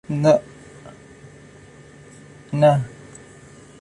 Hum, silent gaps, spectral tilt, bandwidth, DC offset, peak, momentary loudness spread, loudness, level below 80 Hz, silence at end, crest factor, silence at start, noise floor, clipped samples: none; none; -7.5 dB/octave; 11.5 kHz; under 0.1%; -4 dBFS; 26 LU; -19 LUFS; -58 dBFS; 0.9 s; 20 dB; 0.1 s; -45 dBFS; under 0.1%